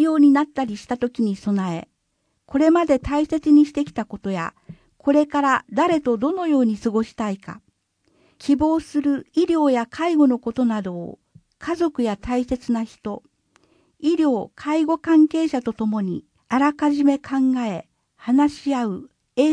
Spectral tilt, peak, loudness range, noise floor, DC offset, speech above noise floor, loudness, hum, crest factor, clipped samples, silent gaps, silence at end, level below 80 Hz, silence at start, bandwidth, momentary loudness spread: -6.5 dB/octave; -4 dBFS; 4 LU; -71 dBFS; under 0.1%; 51 dB; -21 LUFS; none; 16 dB; under 0.1%; none; 0 s; -50 dBFS; 0 s; 10 kHz; 13 LU